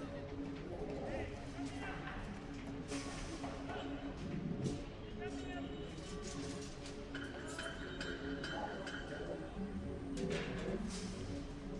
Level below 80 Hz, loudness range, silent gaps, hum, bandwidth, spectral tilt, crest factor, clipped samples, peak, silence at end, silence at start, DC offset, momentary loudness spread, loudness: -54 dBFS; 2 LU; none; none; 11.5 kHz; -5.5 dB/octave; 18 dB; under 0.1%; -26 dBFS; 0 s; 0 s; under 0.1%; 5 LU; -45 LUFS